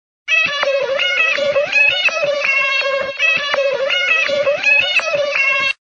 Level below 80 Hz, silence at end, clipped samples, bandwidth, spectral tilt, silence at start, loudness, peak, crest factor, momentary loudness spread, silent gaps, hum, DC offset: -60 dBFS; 0.1 s; under 0.1%; 8.4 kHz; -0.5 dB/octave; 0.25 s; -14 LUFS; -2 dBFS; 14 dB; 5 LU; none; none; under 0.1%